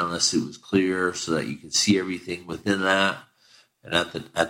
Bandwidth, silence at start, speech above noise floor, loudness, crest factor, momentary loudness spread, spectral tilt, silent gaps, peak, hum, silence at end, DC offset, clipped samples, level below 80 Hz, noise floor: 16 kHz; 0 s; 33 dB; -24 LUFS; 18 dB; 10 LU; -3 dB/octave; none; -8 dBFS; none; 0 s; under 0.1%; under 0.1%; -58 dBFS; -58 dBFS